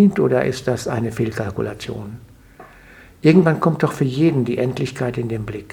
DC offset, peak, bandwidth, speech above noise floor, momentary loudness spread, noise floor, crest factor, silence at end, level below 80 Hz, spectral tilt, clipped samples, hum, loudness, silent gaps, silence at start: under 0.1%; -2 dBFS; 17.5 kHz; 26 dB; 14 LU; -45 dBFS; 18 dB; 0 s; -48 dBFS; -7.5 dB/octave; under 0.1%; none; -19 LUFS; none; 0 s